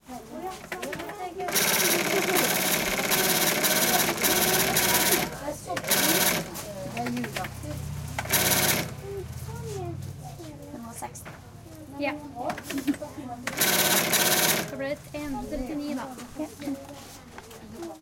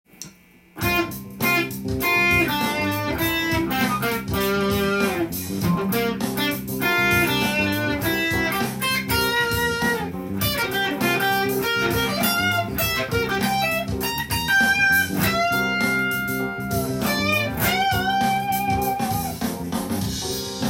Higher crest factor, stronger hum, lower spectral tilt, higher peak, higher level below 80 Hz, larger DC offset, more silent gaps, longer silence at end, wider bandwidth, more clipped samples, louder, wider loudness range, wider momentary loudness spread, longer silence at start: about the same, 20 dB vs 16 dB; neither; second, -2 dB/octave vs -4 dB/octave; about the same, -6 dBFS vs -6 dBFS; second, -52 dBFS vs -42 dBFS; neither; neither; about the same, 0 s vs 0 s; about the same, 17 kHz vs 17 kHz; neither; second, -25 LUFS vs -21 LUFS; first, 13 LU vs 2 LU; first, 20 LU vs 7 LU; second, 0.05 s vs 0.2 s